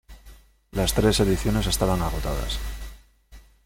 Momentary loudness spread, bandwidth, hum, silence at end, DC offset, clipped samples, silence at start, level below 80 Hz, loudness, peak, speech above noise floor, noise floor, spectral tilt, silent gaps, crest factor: 15 LU; 17 kHz; none; 0.25 s; under 0.1%; under 0.1%; 0.1 s; -32 dBFS; -24 LUFS; -6 dBFS; 27 dB; -50 dBFS; -5 dB/octave; none; 20 dB